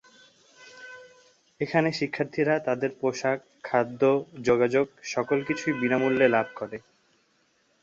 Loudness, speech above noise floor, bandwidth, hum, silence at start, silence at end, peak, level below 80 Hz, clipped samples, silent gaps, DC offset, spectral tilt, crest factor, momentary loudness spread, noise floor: -26 LUFS; 42 dB; 7.8 kHz; none; 0.6 s; 1.05 s; -8 dBFS; -68 dBFS; under 0.1%; none; under 0.1%; -6 dB/octave; 20 dB; 15 LU; -68 dBFS